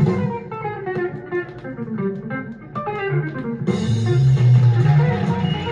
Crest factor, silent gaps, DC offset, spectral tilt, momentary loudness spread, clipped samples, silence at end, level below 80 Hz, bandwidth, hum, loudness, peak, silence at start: 14 dB; none; under 0.1%; -8.5 dB/octave; 14 LU; under 0.1%; 0 s; -46 dBFS; 7.4 kHz; none; -20 LUFS; -6 dBFS; 0 s